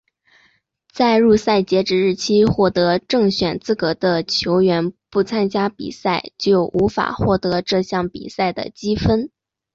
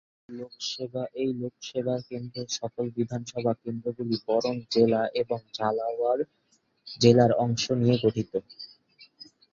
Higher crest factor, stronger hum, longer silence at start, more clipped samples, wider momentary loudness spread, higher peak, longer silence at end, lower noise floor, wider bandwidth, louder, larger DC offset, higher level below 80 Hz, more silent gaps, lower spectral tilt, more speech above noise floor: second, 14 dB vs 22 dB; neither; first, 0.95 s vs 0.3 s; neither; second, 8 LU vs 13 LU; about the same, -4 dBFS vs -4 dBFS; first, 0.45 s vs 0.3 s; about the same, -60 dBFS vs -57 dBFS; about the same, 7.8 kHz vs 7.4 kHz; first, -18 LUFS vs -27 LUFS; neither; first, -42 dBFS vs -62 dBFS; neither; about the same, -6 dB/octave vs -6 dB/octave; first, 42 dB vs 30 dB